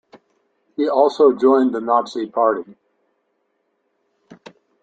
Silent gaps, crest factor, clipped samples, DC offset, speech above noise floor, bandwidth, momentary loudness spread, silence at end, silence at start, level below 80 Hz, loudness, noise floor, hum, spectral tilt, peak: none; 18 dB; under 0.1%; under 0.1%; 53 dB; 7.8 kHz; 10 LU; 0.5 s; 0.8 s; -70 dBFS; -17 LUFS; -69 dBFS; none; -5.5 dB/octave; -2 dBFS